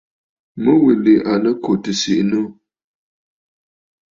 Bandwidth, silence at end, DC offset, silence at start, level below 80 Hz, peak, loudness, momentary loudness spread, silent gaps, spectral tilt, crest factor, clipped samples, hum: 7.6 kHz; 1.65 s; under 0.1%; 0.55 s; -58 dBFS; -2 dBFS; -16 LUFS; 8 LU; none; -5.5 dB/octave; 16 dB; under 0.1%; none